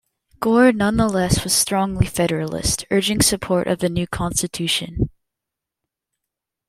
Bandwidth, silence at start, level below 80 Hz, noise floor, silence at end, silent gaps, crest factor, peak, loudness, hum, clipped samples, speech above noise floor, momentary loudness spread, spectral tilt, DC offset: 16.5 kHz; 0.4 s; -38 dBFS; -84 dBFS; 1.6 s; none; 18 dB; -2 dBFS; -19 LUFS; none; under 0.1%; 65 dB; 7 LU; -4 dB/octave; under 0.1%